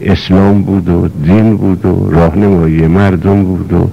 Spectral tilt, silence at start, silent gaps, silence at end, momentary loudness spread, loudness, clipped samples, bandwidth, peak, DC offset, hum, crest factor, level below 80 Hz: -9 dB/octave; 0 s; none; 0 s; 3 LU; -9 LUFS; under 0.1%; 7.6 kHz; -2 dBFS; 2%; none; 8 dB; -26 dBFS